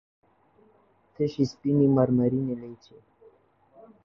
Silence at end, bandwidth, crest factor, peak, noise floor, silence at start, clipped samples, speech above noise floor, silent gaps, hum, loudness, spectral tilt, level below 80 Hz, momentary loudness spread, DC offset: 1.3 s; 7 kHz; 20 dB; -8 dBFS; -63 dBFS; 1.2 s; under 0.1%; 38 dB; none; none; -25 LUFS; -9 dB/octave; -62 dBFS; 13 LU; under 0.1%